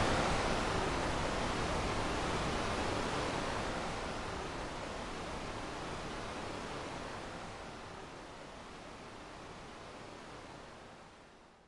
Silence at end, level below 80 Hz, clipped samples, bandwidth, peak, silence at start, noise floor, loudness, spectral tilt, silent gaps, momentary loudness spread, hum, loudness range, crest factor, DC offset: 0.1 s; -48 dBFS; under 0.1%; 11.5 kHz; -20 dBFS; 0 s; -59 dBFS; -39 LUFS; -4.5 dB/octave; none; 15 LU; none; 14 LU; 20 dB; under 0.1%